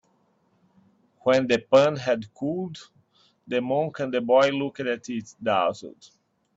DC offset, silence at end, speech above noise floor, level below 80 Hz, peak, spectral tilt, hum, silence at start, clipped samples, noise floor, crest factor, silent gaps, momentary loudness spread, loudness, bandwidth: under 0.1%; 0.7 s; 43 dB; -68 dBFS; -6 dBFS; -5.5 dB/octave; none; 1.25 s; under 0.1%; -66 dBFS; 20 dB; none; 14 LU; -24 LUFS; 8 kHz